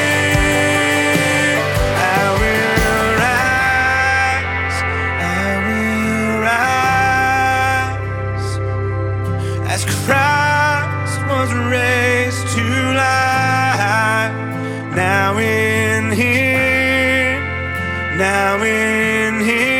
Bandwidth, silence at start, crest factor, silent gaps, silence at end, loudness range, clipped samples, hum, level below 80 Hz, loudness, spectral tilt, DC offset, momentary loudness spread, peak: 18 kHz; 0 s; 16 dB; none; 0 s; 3 LU; under 0.1%; none; -34 dBFS; -15 LUFS; -4.5 dB/octave; under 0.1%; 7 LU; 0 dBFS